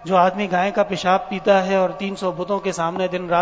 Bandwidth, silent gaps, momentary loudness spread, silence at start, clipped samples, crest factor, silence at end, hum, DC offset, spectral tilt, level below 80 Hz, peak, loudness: 8 kHz; none; 7 LU; 0 s; under 0.1%; 16 dB; 0 s; none; under 0.1%; -5.5 dB/octave; -56 dBFS; -4 dBFS; -20 LUFS